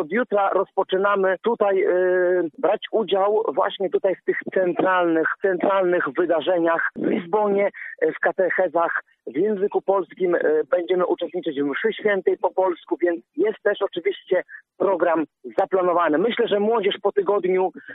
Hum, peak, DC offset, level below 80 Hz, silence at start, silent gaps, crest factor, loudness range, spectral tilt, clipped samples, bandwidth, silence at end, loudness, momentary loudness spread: none; -6 dBFS; under 0.1%; -74 dBFS; 0 s; none; 16 dB; 2 LU; -8.5 dB/octave; under 0.1%; 4 kHz; 0 s; -22 LUFS; 5 LU